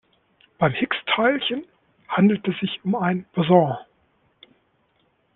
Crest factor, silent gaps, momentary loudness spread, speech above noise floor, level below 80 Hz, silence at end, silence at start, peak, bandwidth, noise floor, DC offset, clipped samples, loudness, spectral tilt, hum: 20 dB; none; 9 LU; 45 dB; -64 dBFS; 1.55 s; 0.6 s; -4 dBFS; 4.1 kHz; -66 dBFS; under 0.1%; under 0.1%; -22 LUFS; -10 dB/octave; none